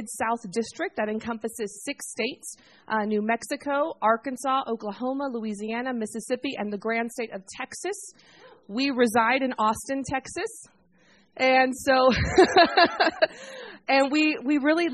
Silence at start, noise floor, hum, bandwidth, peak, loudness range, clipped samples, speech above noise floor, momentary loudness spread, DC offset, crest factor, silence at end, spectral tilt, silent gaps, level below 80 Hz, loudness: 0 s; -61 dBFS; none; 12.5 kHz; -6 dBFS; 9 LU; under 0.1%; 35 dB; 14 LU; under 0.1%; 20 dB; 0 s; -4 dB/octave; none; -52 dBFS; -25 LUFS